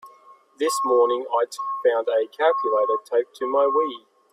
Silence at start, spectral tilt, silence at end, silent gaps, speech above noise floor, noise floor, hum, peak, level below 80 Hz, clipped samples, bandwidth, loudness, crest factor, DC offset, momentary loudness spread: 0.05 s; -1.5 dB/octave; 0.35 s; none; 30 dB; -52 dBFS; none; -8 dBFS; -76 dBFS; under 0.1%; 14 kHz; -22 LUFS; 14 dB; under 0.1%; 6 LU